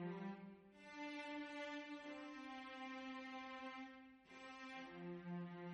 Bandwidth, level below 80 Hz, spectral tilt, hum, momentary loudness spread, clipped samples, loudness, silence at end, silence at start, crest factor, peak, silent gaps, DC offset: 10 kHz; -86 dBFS; -6 dB/octave; none; 9 LU; under 0.1%; -52 LUFS; 0 s; 0 s; 14 dB; -40 dBFS; none; under 0.1%